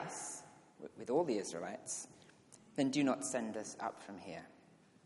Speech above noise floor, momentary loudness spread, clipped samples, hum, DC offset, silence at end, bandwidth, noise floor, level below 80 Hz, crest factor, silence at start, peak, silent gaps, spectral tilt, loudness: 27 dB; 18 LU; under 0.1%; none; under 0.1%; 0.5 s; 11.5 kHz; -65 dBFS; -86 dBFS; 20 dB; 0 s; -20 dBFS; none; -4 dB/octave; -40 LUFS